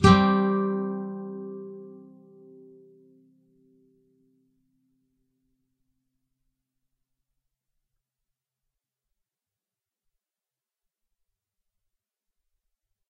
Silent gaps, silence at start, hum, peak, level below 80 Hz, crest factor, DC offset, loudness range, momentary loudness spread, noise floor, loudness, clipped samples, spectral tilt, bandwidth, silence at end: none; 0 s; none; -4 dBFS; -52 dBFS; 28 dB; under 0.1%; 26 LU; 25 LU; under -90 dBFS; -25 LUFS; under 0.1%; -6 dB/octave; 5.4 kHz; 11.15 s